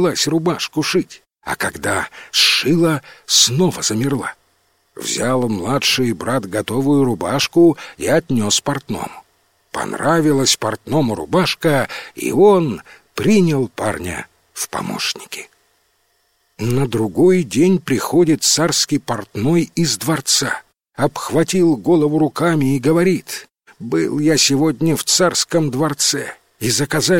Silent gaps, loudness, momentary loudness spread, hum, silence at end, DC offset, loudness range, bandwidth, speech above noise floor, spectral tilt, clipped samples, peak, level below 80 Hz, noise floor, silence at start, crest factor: none; -16 LUFS; 12 LU; none; 0 s; under 0.1%; 3 LU; 16.5 kHz; 46 dB; -4 dB/octave; under 0.1%; 0 dBFS; -50 dBFS; -63 dBFS; 0 s; 18 dB